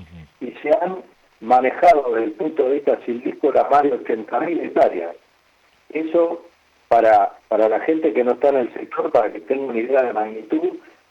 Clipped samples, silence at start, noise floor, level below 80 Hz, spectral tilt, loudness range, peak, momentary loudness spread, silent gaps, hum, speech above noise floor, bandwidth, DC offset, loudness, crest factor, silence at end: under 0.1%; 0 s; -58 dBFS; -60 dBFS; -6.5 dB/octave; 3 LU; -4 dBFS; 13 LU; none; none; 40 dB; 8 kHz; under 0.1%; -19 LUFS; 14 dB; 0.3 s